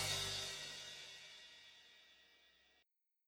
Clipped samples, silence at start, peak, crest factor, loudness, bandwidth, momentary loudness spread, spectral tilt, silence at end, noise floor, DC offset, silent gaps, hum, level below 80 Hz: under 0.1%; 0 s; -28 dBFS; 22 dB; -45 LUFS; over 20 kHz; 24 LU; -1 dB/octave; 0.75 s; -82 dBFS; under 0.1%; none; none; -72 dBFS